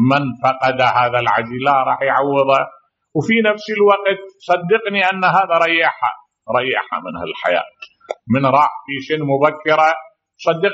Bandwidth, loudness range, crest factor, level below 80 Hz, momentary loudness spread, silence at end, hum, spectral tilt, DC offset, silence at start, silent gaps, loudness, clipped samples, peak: 8 kHz; 3 LU; 16 dB; -60 dBFS; 11 LU; 0 s; none; -3 dB/octave; under 0.1%; 0 s; none; -16 LUFS; under 0.1%; 0 dBFS